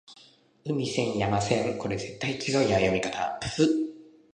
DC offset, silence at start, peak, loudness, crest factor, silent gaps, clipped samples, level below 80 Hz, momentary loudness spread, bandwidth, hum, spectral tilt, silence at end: under 0.1%; 0.1 s; -10 dBFS; -27 LUFS; 18 dB; none; under 0.1%; -54 dBFS; 8 LU; 10.5 kHz; none; -5 dB/octave; 0.25 s